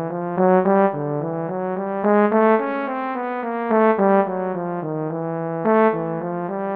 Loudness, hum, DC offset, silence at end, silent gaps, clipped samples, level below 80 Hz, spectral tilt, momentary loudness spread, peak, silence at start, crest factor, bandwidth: -20 LUFS; none; under 0.1%; 0 s; none; under 0.1%; -68 dBFS; -11.5 dB/octave; 9 LU; -4 dBFS; 0 s; 16 dB; 4.4 kHz